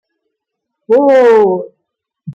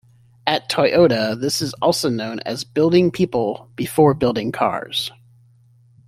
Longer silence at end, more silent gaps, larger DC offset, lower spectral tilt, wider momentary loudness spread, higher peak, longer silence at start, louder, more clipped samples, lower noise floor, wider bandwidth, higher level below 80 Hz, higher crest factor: second, 0.05 s vs 1 s; neither; neither; first, -7 dB/octave vs -5 dB/octave; about the same, 8 LU vs 10 LU; about the same, -2 dBFS vs -2 dBFS; first, 0.9 s vs 0.45 s; first, -10 LUFS vs -19 LUFS; neither; first, -75 dBFS vs -53 dBFS; second, 7.6 kHz vs 16 kHz; second, -62 dBFS vs -54 dBFS; second, 12 dB vs 18 dB